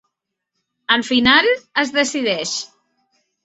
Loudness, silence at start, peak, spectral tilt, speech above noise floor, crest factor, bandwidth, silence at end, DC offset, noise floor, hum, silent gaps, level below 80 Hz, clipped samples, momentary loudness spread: -16 LUFS; 0.9 s; 0 dBFS; -2 dB/octave; 61 dB; 20 dB; 8.2 kHz; 0.8 s; under 0.1%; -78 dBFS; none; none; -54 dBFS; under 0.1%; 13 LU